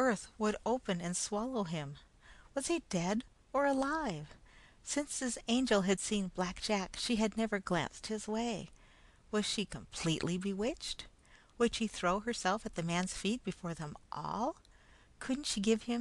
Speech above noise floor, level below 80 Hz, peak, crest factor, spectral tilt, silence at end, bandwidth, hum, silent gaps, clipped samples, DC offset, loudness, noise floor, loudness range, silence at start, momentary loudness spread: 26 dB; -58 dBFS; -18 dBFS; 18 dB; -4 dB/octave; 0 s; 12.5 kHz; none; none; under 0.1%; under 0.1%; -36 LUFS; -62 dBFS; 3 LU; 0 s; 10 LU